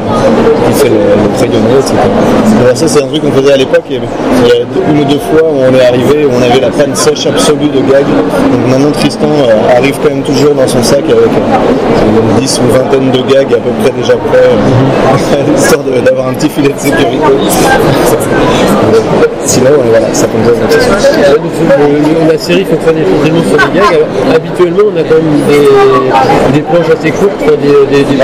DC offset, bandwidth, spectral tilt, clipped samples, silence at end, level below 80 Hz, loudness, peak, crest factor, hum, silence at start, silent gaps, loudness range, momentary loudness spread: 0.3%; 16 kHz; -5.5 dB/octave; 0.4%; 0 s; -30 dBFS; -7 LUFS; 0 dBFS; 6 dB; none; 0 s; none; 1 LU; 3 LU